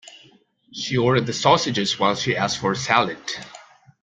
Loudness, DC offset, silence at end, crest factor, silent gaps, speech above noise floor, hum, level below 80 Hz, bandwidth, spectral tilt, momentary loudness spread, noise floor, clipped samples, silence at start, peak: -21 LUFS; under 0.1%; 0.4 s; 20 dB; none; 35 dB; none; -58 dBFS; 9.4 kHz; -4 dB/octave; 13 LU; -55 dBFS; under 0.1%; 0.1 s; -2 dBFS